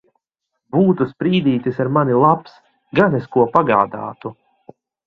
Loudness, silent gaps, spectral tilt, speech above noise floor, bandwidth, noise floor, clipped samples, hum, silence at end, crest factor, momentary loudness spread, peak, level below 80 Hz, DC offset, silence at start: -17 LUFS; none; -9.5 dB/octave; 61 dB; 5.6 kHz; -77 dBFS; under 0.1%; none; 0.75 s; 18 dB; 10 LU; 0 dBFS; -56 dBFS; under 0.1%; 0.75 s